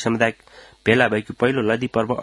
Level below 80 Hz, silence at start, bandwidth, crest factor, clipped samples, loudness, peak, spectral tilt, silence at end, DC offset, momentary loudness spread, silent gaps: -56 dBFS; 0 s; 11.5 kHz; 20 dB; under 0.1%; -20 LUFS; 0 dBFS; -6 dB/octave; 0 s; under 0.1%; 5 LU; none